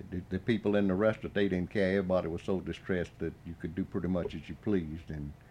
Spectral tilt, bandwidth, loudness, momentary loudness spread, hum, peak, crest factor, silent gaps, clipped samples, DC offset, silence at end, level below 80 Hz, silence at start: -8 dB/octave; 9.8 kHz; -33 LUFS; 11 LU; none; -16 dBFS; 16 dB; none; under 0.1%; under 0.1%; 0.05 s; -54 dBFS; 0 s